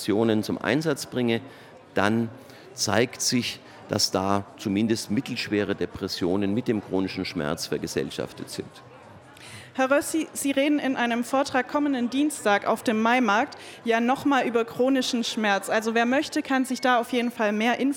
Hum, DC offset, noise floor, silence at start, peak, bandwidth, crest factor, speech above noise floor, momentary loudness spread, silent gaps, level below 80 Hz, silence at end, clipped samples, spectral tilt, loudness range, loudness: none; under 0.1%; -47 dBFS; 0 s; -4 dBFS; 18 kHz; 22 dB; 23 dB; 9 LU; none; -62 dBFS; 0 s; under 0.1%; -4 dB/octave; 5 LU; -25 LUFS